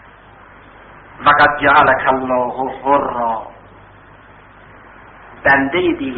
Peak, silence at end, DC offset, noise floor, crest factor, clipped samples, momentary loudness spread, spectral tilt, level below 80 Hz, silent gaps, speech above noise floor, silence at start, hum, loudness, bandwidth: 0 dBFS; 0 s; under 0.1%; -42 dBFS; 18 dB; under 0.1%; 11 LU; -2.5 dB/octave; -46 dBFS; none; 28 dB; 1.2 s; none; -14 LUFS; 4.8 kHz